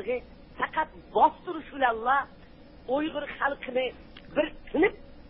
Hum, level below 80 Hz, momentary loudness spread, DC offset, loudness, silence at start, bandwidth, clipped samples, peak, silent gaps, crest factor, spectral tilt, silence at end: none; -54 dBFS; 12 LU; under 0.1%; -29 LUFS; 0 s; 5.6 kHz; under 0.1%; -8 dBFS; none; 20 dB; -8.5 dB/octave; 0 s